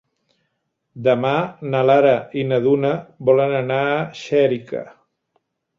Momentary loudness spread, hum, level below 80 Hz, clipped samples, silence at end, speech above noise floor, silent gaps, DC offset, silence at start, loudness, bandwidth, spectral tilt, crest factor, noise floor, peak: 8 LU; none; -62 dBFS; under 0.1%; 0.9 s; 55 dB; none; under 0.1%; 0.95 s; -18 LUFS; 7.4 kHz; -7.5 dB/octave; 18 dB; -73 dBFS; -2 dBFS